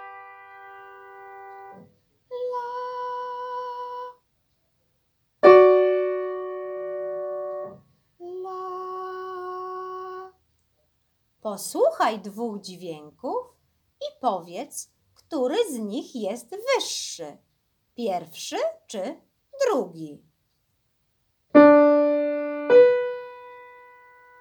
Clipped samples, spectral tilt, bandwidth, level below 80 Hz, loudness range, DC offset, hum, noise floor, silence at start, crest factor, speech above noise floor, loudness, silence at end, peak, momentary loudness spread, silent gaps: under 0.1%; -4 dB/octave; 19.5 kHz; -76 dBFS; 15 LU; under 0.1%; none; -71 dBFS; 0 s; 24 dB; 44 dB; -23 LUFS; 0.7 s; -2 dBFS; 26 LU; none